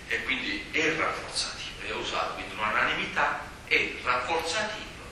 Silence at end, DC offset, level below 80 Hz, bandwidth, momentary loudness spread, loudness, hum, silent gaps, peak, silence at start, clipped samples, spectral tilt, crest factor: 0 s; under 0.1%; -52 dBFS; 14.5 kHz; 8 LU; -28 LUFS; none; none; -10 dBFS; 0 s; under 0.1%; -2.5 dB/octave; 20 dB